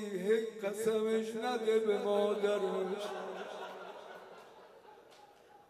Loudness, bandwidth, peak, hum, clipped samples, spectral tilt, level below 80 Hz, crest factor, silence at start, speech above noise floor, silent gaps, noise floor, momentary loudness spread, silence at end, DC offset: -34 LUFS; 14.5 kHz; -20 dBFS; none; under 0.1%; -5 dB/octave; -86 dBFS; 16 dB; 0 s; 26 dB; none; -60 dBFS; 18 LU; 0.15 s; under 0.1%